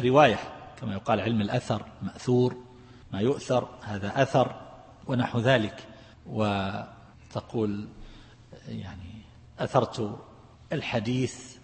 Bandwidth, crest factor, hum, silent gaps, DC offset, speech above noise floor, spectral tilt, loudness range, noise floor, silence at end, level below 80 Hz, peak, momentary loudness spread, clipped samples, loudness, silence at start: 8.8 kHz; 24 dB; none; none; under 0.1%; 23 dB; -6.5 dB/octave; 6 LU; -50 dBFS; 0.05 s; -56 dBFS; -6 dBFS; 20 LU; under 0.1%; -28 LUFS; 0 s